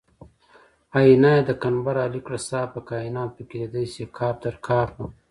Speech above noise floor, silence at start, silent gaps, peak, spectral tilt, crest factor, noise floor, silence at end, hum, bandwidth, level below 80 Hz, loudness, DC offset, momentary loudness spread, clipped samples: 33 dB; 0.95 s; none; -4 dBFS; -7 dB/octave; 20 dB; -56 dBFS; 0.2 s; none; 11.5 kHz; -52 dBFS; -23 LUFS; under 0.1%; 15 LU; under 0.1%